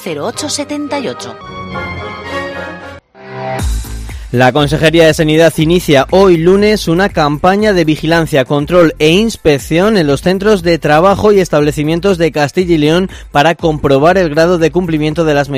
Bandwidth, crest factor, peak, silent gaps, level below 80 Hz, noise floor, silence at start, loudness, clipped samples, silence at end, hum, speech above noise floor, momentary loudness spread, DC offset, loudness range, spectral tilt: 16 kHz; 10 dB; 0 dBFS; none; -30 dBFS; -31 dBFS; 0 s; -11 LUFS; 0.7%; 0 s; none; 21 dB; 14 LU; under 0.1%; 11 LU; -5.5 dB/octave